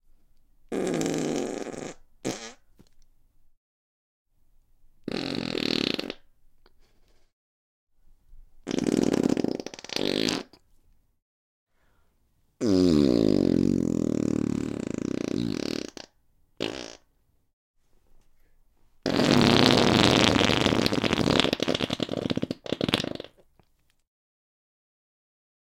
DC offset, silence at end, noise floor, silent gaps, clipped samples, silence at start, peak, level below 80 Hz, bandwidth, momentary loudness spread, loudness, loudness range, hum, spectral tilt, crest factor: under 0.1%; 2.4 s; -67 dBFS; 3.57-4.25 s, 7.33-7.87 s, 11.22-11.67 s, 17.53-17.74 s; under 0.1%; 0.7 s; 0 dBFS; -52 dBFS; 17 kHz; 18 LU; -25 LUFS; 14 LU; none; -5 dB/octave; 28 dB